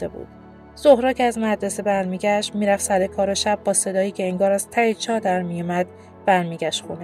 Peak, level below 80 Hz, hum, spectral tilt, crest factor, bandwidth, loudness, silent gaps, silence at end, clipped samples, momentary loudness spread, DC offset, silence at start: -2 dBFS; -56 dBFS; none; -4 dB/octave; 20 dB; 15.5 kHz; -21 LUFS; none; 0 s; under 0.1%; 8 LU; under 0.1%; 0 s